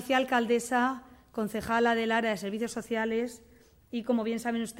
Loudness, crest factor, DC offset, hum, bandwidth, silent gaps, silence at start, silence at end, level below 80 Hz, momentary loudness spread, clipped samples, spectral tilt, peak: -29 LUFS; 18 dB; under 0.1%; none; 16 kHz; none; 0 s; 0 s; -62 dBFS; 11 LU; under 0.1%; -4 dB/octave; -12 dBFS